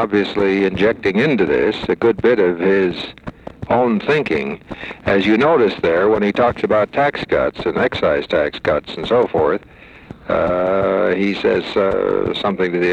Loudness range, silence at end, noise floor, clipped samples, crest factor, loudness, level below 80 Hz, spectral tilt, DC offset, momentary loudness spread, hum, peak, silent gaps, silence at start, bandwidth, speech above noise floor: 2 LU; 0 s; -38 dBFS; under 0.1%; 12 dB; -17 LUFS; -44 dBFS; -7 dB/octave; under 0.1%; 7 LU; none; -4 dBFS; none; 0 s; 8.6 kHz; 22 dB